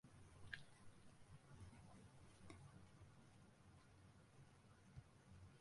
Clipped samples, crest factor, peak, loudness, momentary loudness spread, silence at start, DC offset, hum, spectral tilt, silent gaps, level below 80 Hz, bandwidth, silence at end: under 0.1%; 32 dB; -32 dBFS; -65 LUFS; 11 LU; 0.05 s; under 0.1%; none; -5 dB/octave; none; -74 dBFS; 11.5 kHz; 0 s